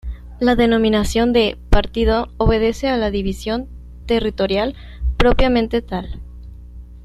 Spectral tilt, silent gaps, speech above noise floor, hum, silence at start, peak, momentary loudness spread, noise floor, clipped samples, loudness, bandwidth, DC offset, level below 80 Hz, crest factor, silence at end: -6 dB/octave; none; 20 dB; 60 Hz at -35 dBFS; 0.05 s; 0 dBFS; 19 LU; -36 dBFS; under 0.1%; -18 LUFS; 13 kHz; under 0.1%; -26 dBFS; 16 dB; 0 s